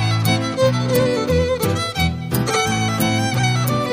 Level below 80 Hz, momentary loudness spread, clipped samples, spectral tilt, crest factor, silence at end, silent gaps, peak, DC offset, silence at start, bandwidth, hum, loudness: -36 dBFS; 3 LU; under 0.1%; -5 dB/octave; 14 dB; 0 s; none; -4 dBFS; under 0.1%; 0 s; 15.5 kHz; none; -18 LUFS